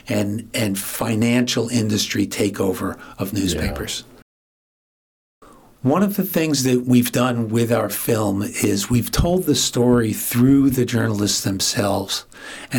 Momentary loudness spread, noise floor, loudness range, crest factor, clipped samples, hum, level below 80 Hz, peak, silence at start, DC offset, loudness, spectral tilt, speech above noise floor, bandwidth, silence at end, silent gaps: 9 LU; under -90 dBFS; 7 LU; 16 dB; under 0.1%; none; -40 dBFS; -4 dBFS; 0.05 s; under 0.1%; -19 LUFS; -4.5 dB/octave; over 71 dB; 19 kHz; 0 s; 4.22-5.41 s